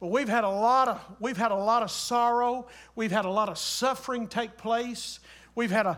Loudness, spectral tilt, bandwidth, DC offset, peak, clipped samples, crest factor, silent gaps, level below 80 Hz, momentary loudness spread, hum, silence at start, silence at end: -27 LUFS; -3.5 dB/octave; 17.5 kHz; under 0.1%; -12 dBFS; under 0.1%; 16 dB; none; -64 dBFS; 11 LU; none; 0 s; 0 s